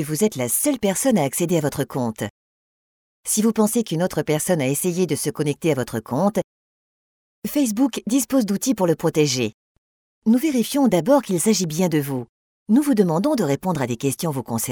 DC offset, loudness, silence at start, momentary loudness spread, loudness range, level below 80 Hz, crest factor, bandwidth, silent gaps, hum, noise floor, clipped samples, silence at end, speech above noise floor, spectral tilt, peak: under 0.1%; -21 LUFS; 0 s; 7 LU; 3 LU; -58 dBFS; 18 dB; over 20 kHz; 2.30-3.23 s, 6.44-7.42 s, 9.54-10.22 s, 12.29-12.66 s; none; under -90 dBFS; under 0.1%; 0 s; over 70 dB; -5 dB/octave; -4 dBFS